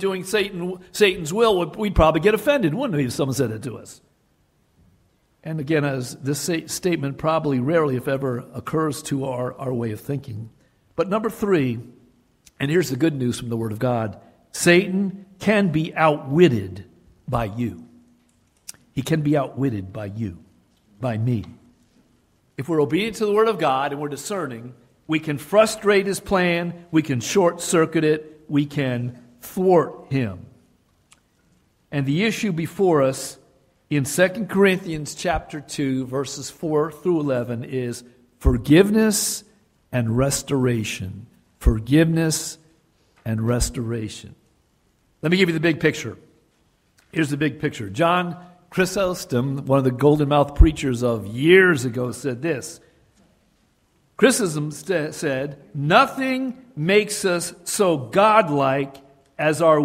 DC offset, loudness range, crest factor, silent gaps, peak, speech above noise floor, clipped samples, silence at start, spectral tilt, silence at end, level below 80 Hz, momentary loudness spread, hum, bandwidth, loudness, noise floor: under 0.1%; 6 LU; 20 dB; none; 0 dBFS; 43 dB; under 0.1%; 0 s; -5.5 dB/octave; 0 s; -36 dBFS; 14 LU; none; 16 kHz; -21 LUFS; -63 dBFS